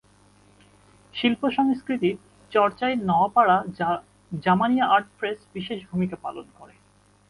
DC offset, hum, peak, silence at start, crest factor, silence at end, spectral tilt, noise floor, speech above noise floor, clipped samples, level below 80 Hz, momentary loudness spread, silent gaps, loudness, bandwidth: under 0.1%; 50 Hz at -55 dBFS; -6 dBFS; 1.15 s; 18 dB; 0.65 s; -7 dB/octave; -59 dBFS; 36 dB; under 0.1%; -62 dBFS; 15 LU; none; -23 LUFS; 11.5 kHz